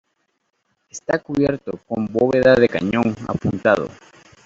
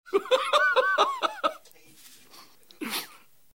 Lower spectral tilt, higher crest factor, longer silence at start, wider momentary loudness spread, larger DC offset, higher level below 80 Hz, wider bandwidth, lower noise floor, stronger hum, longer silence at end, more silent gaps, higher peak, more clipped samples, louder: first, -6.5 dB/octave vs -1 dB/octave; about the same, 18 dB vs 20 dB; first, 0.95 s vs 0.05 s; about the same, 14 LU vs 12 LU; second, under 0.1% vs 0.1%; first, -50 dBFS vs -78 dBFS; second, 7.8 kHz vs 16.5 kHz; first, -70 dBFS vs -54 dBFS; neither; about the same, 0.5 s vs 0.5 s; neither; first, -2 dBFS vs -8 dBFS; neither; first, -19 LUFS vs -25 LUFS